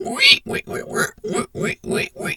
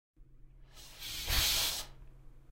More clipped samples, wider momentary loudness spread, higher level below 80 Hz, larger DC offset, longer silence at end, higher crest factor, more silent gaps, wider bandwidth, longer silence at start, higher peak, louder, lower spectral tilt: neither; second, 14 LU vs 23 LU; second, -52 dBFS vs -46 dBFS; neither; about the same, 0 s vs 0.1 s; about the same, 20 dB vs 22 dB; neither; first, 19 kHz vs 16 kHz; second, 0 s vs 0.2 s; first, 0 dBFS vs -16 dBFS; first, -19 LUFS vs -32 LUFS; first, -2.5 dB/octave vs -0.5 dB/octave